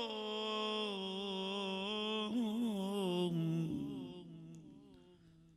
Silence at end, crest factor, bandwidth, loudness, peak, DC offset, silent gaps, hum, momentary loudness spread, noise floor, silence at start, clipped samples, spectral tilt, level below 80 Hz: 0.1 s; 14 dB; 14 kHz; -39 LUFS; -26 dBFS; under 0.1%; none; none; 16 LU; -63 dBFS; 0 s; under 0.1%; -6 dB/octave; -74 dBFS